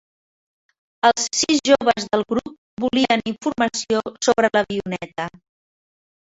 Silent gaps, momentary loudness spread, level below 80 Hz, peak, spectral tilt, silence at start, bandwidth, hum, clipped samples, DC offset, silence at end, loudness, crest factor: 2.58-2.77 s; 11 LU; -56 dBFS; -2 dBFS; -3 dB/octave; 1.05 s; 8.2 kHz; none; under 0.1%; under 0.1%; 1 s; -20 LUFS; 20 dB